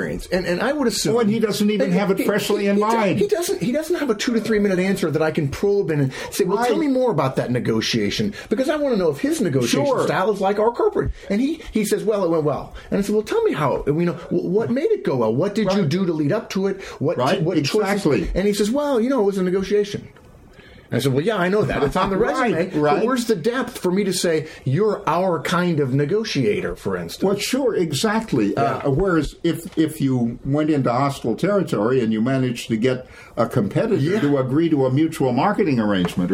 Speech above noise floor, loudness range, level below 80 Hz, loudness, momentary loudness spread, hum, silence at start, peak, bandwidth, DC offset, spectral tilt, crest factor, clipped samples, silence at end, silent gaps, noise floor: 26 dB; 2 LU; -44 dBFS; -20 LUFS; 4 LU; none; 0 s; -4 dBFS; 16.5 kHz; under 0.1%; -6 dB/octave; 16 dB; under 0.1%; 0 s; none; -45 dBFS